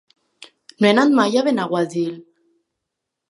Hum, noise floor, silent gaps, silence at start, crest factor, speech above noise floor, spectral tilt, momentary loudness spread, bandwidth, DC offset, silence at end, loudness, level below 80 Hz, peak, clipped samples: none; -81 dBFS; none; 0.8 s; 20 dB; 64 dB; -5.5 dB/octave; 11 LU; 11.5 kHz; under 0.1%; 1.1 s; -18 LUFS; -72 dBFS; -2 dBFS; under 0.1%